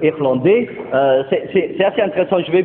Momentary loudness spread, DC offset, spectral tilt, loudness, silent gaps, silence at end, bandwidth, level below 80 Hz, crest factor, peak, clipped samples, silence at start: 3 LU; under 0.1%; -11.5 dB/octave; -16 LUFS; none; 0 s; 4 kHz; -56 dBFS; 14 dB; 0 dBFS; under 0.1%; 0 s